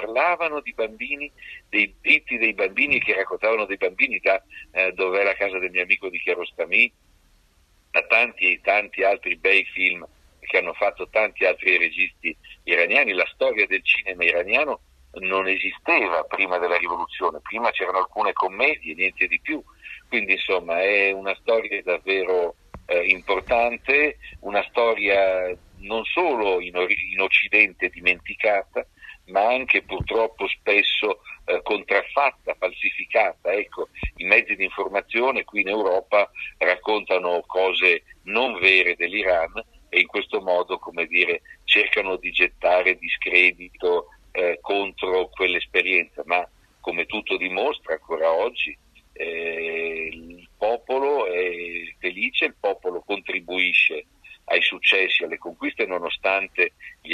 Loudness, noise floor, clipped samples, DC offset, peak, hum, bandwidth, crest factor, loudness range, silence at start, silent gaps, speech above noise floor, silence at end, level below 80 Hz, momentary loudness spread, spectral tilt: -21 LUFS; -60 dBFS; under 0.1%; under 0.1%; 0 dBFS; none; 11.5 kHz; 22 dB; 4 LU; 0 s; none; 37 dB; 0 s; -52 dBFS; 11 LU; -4.5 dB/octave